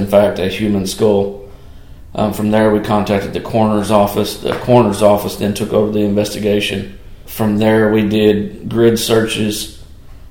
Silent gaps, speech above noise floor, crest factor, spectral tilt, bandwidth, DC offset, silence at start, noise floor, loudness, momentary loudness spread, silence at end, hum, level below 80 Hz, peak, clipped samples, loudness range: none; 22 dB; 14 dB; -5.5 dB/octave; 17.5 kHz; 0.8%; 0 s; -35 dBFS; -14 LUFS; 8 LU; 0.05 s; none; -38 dBFS; 0 dBFS; under 0.1%; 2 LU